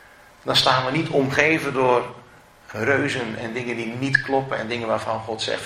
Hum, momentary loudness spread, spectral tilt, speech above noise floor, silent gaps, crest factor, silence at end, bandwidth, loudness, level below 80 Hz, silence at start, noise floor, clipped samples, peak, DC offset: none; 10 LU; -4.5 dB/octave; 25 dB; none; 22 dB; 0 s; 16 kHz; -21 LUFS; -56 dBFS; 0.45 s; -47 dBFS; under 0.1%; -2 dBFS; under 0.1%